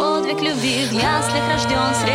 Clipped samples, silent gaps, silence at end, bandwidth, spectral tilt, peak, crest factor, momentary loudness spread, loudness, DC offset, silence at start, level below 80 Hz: under 0.1%; none; 0 s; 17 kHz; -4 dB/octave; -6 dBFS; 14 dB; 2 LU; -18 LUFS; under 0.1%; 0 s; -42 dBFS